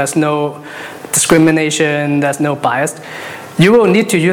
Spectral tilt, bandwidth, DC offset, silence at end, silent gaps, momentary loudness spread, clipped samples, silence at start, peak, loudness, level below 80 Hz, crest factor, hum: -4.5 dB/octave; 19 kHz; under 0.1%; 0 s; none; 17 LU; under 0.1%; 0 s; 0 dBFS; -12 LUFS; -50 dBFS; 12 dB; none